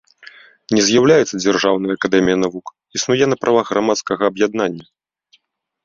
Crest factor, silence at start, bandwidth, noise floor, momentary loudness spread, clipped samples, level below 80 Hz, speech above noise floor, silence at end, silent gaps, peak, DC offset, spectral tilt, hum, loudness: 16 dB; 0.7 s; 7.6 kHz; -60 dBFS; 10 LU; under 0.1%; -54 dBFS; 44 dB; 1.05 s; none; -2 dBFS; under 0.1%; -4 dB/octave; none; -16 LUFS